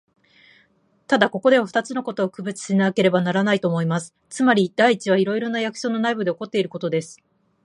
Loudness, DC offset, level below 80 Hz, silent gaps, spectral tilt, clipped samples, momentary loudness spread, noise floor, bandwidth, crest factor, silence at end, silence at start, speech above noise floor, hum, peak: -21 LUFS; under 0.1%; -70 dBFS; none; -5.5 dB/octave; under 0.1%; 8 LU; -61 dBFS; 11 kHz; 20 dB; 0.5 s; 1.1 s; 41 dB; none; -2 dBFS